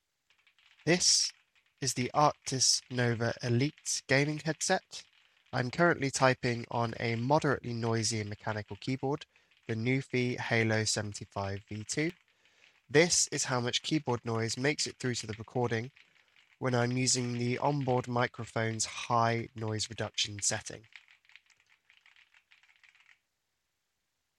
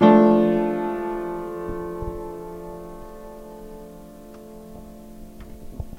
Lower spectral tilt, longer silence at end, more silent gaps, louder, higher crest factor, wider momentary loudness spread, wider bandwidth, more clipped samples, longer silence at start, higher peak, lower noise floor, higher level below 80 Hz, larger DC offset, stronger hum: second, -3.5 dB/octave vs -8 dB/octave; first, 3.4 s vs 0 s; neither; second, -31 LUFS vs -22 LUFS; about the same, 24 dB vs 22 dB; second, 11 LU vs 25 LU; second, 14 kHz vs 15.5 kHz; neither; first, 0.85 s vs 0 s; second, -10 dBFS vs -2 dBFS; first, -83 dBFS vs -42 dBFS; second, -68 dBFS vs -42 dBFS; neither; neither